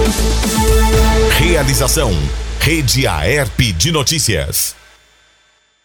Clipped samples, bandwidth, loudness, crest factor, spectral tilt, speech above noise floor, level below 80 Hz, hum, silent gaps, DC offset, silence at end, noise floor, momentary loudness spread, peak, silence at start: under 0.1%; 19.5 kHz; -14 LUFS; 14 dB; -3.5 dB/octave; 40 dB; -18 dBFS; none; none; under 0.1%; 1.15 s; -55 dBFS; 5 LU; 0 dBFS; 0 s